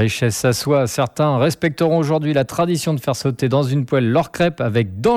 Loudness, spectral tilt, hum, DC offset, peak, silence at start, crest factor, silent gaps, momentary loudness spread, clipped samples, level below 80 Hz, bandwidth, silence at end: -18 LUFS; -6 dB/octave; none; under 0.1%; -4 dBFS; 0 s; 14 dB; none; 3 LU; under 0.1%; -50 dBFS; 16 kHz; 0 s